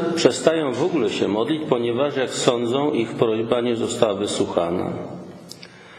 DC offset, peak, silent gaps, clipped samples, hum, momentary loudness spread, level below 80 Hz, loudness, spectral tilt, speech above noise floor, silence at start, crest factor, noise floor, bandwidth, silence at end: under 0.1%; 0 dBFS; none; under 0.1%; none; 14 LU; -58 dBFS; -21 LUFS; -5 dB/octave; 21 dB; 0 s; 22 dB; -42 dBFS; 16 kHz; 0 s